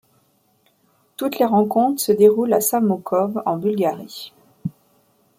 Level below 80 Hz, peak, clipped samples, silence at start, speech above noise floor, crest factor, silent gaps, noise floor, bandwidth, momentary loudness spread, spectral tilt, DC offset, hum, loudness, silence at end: -66 dBFS; -2 dBFS; under 0.1%; 1.2 s; 44 dB; 18 dB; none; -62 dBFS; 16.5 kHz; 18 LU; -5.5 dB/octave; under 0.1%; none; -18 LUFS; 0.7 s